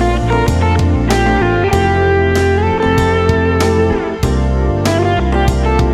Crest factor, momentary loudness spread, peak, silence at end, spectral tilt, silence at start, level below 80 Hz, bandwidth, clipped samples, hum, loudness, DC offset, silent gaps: 12 dB; 3 LU; 0 dBFS; 0 s; -6.5 dB/octave; 0 s; -20 dBFS; 15 kHz; under 0.1%; none; -13 LUFS; under 0.1%; none